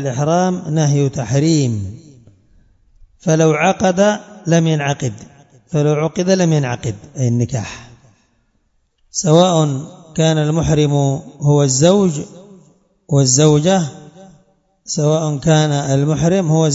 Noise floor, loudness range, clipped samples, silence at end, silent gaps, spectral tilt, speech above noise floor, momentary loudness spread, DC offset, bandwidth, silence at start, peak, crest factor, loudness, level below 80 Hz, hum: -62 dBFS; 4 LU; under 0.1%; 0 s; none; -5.5 dB/octave; 47 dB; 13 LU; under 0.1%; 7.8 kHz; 0 s; 0 dBFS; 16 dB; -15 LUFS; -46 dBFS; none